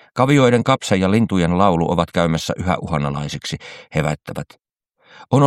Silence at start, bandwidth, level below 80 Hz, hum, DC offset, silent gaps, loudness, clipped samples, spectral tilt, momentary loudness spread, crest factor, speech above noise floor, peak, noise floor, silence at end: 0.15 s; 14 kHz; -42 dBFS; none; under 0.1%; none; -18 LUFS; under 0.1%; -6 dB/octave; 14 LU; 18 dB; 40 dB; 0 dBFS; -58 dBFS; 0 s